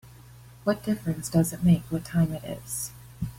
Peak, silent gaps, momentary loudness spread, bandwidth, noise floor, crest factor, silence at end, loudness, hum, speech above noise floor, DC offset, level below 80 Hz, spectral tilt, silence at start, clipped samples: -10 dBFS; none; 11 LU; 16.5 kHz; -49 dBFS; 16 dB; 0 s; -27 LUFS; none; 23 dB; under 0.1%; -50 dBFS; -6.5 dB/octave; 0.05 s; under 0.1%